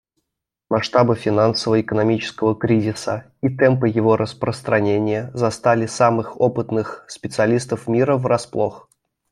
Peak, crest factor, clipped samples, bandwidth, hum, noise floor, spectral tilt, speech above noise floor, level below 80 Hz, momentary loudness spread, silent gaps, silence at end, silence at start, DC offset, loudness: -2 dBFS; 18 dB; under 0.1%; 12 kHz; none; -81 dBFS; -6.5 dB/octave; 62 dB; -56 dBFS; 7 LU; none; 0.5 s; 0.7 s; under 0.1%; -19 LUFS